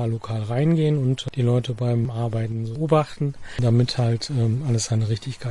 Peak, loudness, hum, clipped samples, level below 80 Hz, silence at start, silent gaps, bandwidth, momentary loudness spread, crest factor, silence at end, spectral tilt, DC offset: -6 dBFS; -23 LUFS; none; under 0.1%; -50 dBFS; 0 s; none; 11 kHz; 7 LU; 16 dB; 0 s; -6.5 dB/octave; under 0.1%